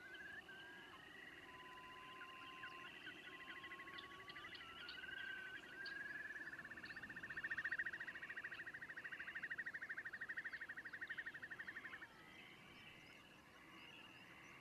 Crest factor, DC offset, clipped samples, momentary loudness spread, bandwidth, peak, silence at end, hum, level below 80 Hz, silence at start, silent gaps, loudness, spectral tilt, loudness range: 20 dB; under 0.1%; under 0.1%; 12 LU; 13 kHz; -34 dBFS; 0 s; none; -82 dBFS; 0 s; none; -52 LUFS; -3 dB/octave; 7 LU